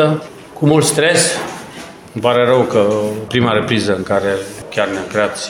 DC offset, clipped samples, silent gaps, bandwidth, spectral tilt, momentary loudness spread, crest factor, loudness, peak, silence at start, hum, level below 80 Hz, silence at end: under 0.1%; under 0.1%; none; 17.5 kHz; -4.5 dB/octave; 15 LU; 16 dB; -15 LUFS; 0 dBFS; 0 s; none; -50 dBFS; 0 s